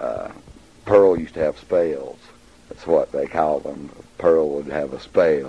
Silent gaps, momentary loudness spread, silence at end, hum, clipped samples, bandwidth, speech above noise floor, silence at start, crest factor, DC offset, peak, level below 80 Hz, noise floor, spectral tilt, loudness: none; 20 LU; 0 s; none; under 0.1%; 10 kHz; 29 dB; 0 s; 18 dB; 0.1%; -2 dBFS; -50 dBFS; -49 dBFS; -7 dB/octave; -20 LUFS